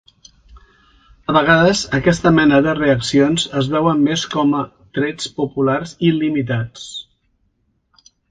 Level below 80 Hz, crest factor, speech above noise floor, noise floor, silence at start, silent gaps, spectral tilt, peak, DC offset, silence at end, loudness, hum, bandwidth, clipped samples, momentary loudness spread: -46 dBFS; 18 dB; 49 dB; -65 dBFS; 0.55 s; none; -5.5 dB/octave; 0 dBFS; under 0.1%; 1.3 s; -16 LUFS; none; 9.4 kHz; under 0.1%; 11 LU